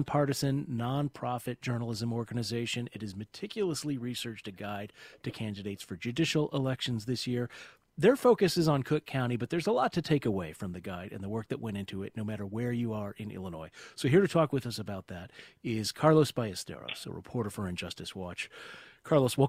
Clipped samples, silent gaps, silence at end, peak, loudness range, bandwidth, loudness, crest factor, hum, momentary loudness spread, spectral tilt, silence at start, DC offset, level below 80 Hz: under 0.1%; none; 0 s; -10 dBFS; 8 LU; 16 kHz; -32 LUFS; 22 dB; none; 15 LU; -6 dB/octave; 0 s; under 0.1%; -62 dBFS